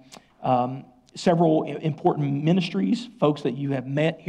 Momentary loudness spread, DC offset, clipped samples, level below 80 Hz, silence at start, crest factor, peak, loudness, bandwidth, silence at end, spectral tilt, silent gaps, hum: 8 LU; under 0.1%; under 0.1%; -66 dBFS; 0.1 s; 16 dB; -8 dBFS; -24 LUFS; 9.8 kHz; 0 s; -7.5 dB/octave; none; none